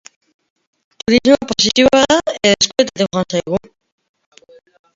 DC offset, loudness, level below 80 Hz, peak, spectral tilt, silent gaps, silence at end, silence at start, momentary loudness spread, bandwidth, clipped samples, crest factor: under 0.1%; -14 LUFS; -46 dBFS; 0 dBFS; -3.5 dB/octave; none; 1.4 s; 1.1 s; 9 LU; 7.8 kHz; under 0.1%; 16 dB